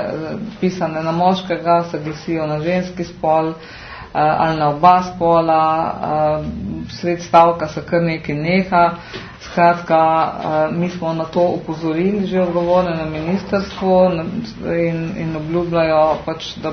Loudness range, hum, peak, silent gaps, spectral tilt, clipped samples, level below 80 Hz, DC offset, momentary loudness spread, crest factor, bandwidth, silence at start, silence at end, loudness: 3 LU; none; 0 dBFS; none; -7 dB/octave; under 0.1%; -44 dBFS; under 0.1%; 11 LU; 16 dB; 6.6 kHz; 0 s; 0 s; -17 LUFS